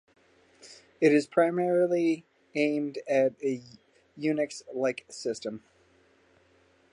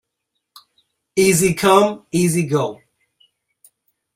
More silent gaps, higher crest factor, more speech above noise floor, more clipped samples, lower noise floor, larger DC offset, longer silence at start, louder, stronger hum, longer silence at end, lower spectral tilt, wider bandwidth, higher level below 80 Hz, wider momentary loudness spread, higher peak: neither; about the same, 20 dB vs 20 dB; second, 37 dB vs 61 dB; neither; second, -64 dBFS vs -77 dBFS; neither; second, 0.65 s vs 1.15 s; second, -28 LUFS vs -17 LUFS; neither; about the same, 1.35 s vs 1.4 s; about the same, -5.5 dB/octave vs -4.5 dB/octave; second, 11 kHz vs 16 kHz; second, -76 dBFS vs -54 dBFS; first, 12 LU vs 8 LU; second, -10 dBFS vs 0 dBFS